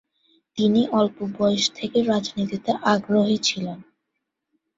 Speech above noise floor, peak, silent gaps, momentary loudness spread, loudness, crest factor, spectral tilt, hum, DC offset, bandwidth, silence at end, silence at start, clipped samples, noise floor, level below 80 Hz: 58 dB; -4 dBFS; none; 9 LU; -22 LUFS; 20 dB; -4.5 dB/octave; none; under 0.1%; 7.8 kHz; 0.95 s; 0.55 s; under 0.1%; -80 dBFS; -62 dBFS